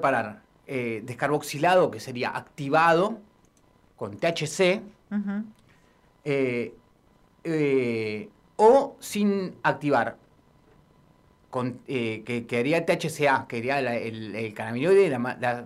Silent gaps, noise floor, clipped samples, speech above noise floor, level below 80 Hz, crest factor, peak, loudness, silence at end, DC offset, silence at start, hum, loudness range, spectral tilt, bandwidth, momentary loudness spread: none; -61 dBFS; under 0.1%; 36 dB; -66 dBFS; 20 dB; -8 dBFS; -25 LUFS; 0 s; under 0.1%; 0 s; none; 5 LU; -5.5 dB/octave; 15.5 kHz; 13 LU